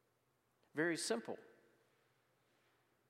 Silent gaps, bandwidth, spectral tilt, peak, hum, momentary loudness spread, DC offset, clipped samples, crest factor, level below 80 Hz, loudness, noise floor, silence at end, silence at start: none; 15.5 kHz; -3 dB/octave; -26 dBFS; none; 14 LU; under 0.1%; under 0.1%; 22 dB; under -90 dBFS; -41 LUFS; -81 dBFS; 1.65 s; 0.75 s